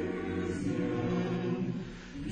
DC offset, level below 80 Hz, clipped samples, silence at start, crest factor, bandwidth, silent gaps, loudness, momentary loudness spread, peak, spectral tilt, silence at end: under 0.1%; -54 dBFS; under 0.1%; 0 s; 12 dB; 9.6 kHz; none; -34 LUFS; 8 LU; -22 dBFS; -7.5 dB/octave; 0 s